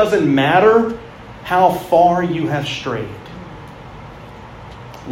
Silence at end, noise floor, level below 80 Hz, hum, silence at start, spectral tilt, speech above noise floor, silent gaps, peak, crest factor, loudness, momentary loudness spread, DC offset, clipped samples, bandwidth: 0 s; -35 dBFS; -46 dBFS; none; 0 s; -6.5 dB/octave; 21 dB; none; 0 dBFS; 16 dB; -15 LUFS; 24 LU; under 0.1%; under 0.1%; 16 kHz